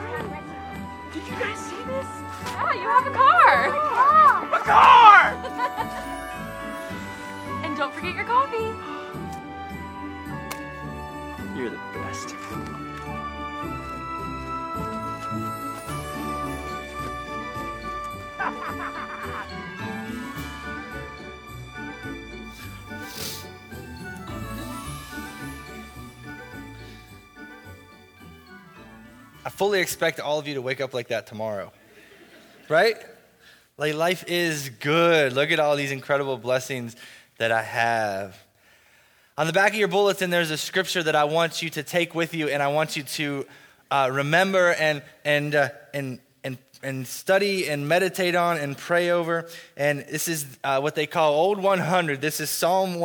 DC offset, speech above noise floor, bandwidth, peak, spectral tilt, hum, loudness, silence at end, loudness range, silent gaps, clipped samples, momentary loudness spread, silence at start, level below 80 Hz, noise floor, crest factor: under 0.1%; 36 dB; over 20 kHz; 0 dBFS; -4 dB/octave; none; -23 LUFS; 0 s; 18 LU; none; under 0.1%; 17 LU; 0 s; -50 dBFS; -58 dBFS; 24 dB